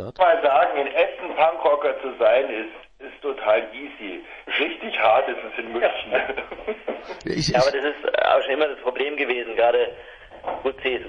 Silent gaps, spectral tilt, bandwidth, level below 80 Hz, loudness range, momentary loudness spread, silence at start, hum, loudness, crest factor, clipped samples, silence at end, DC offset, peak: none; -4.5 dB/octave; 10.5 kHz; -54 dBFS; 2 LU; 15 LU; 0 s; none; -22 LUFS; 20 dB; under 0.1%; 0 s; under 0.1%; -2 dBFS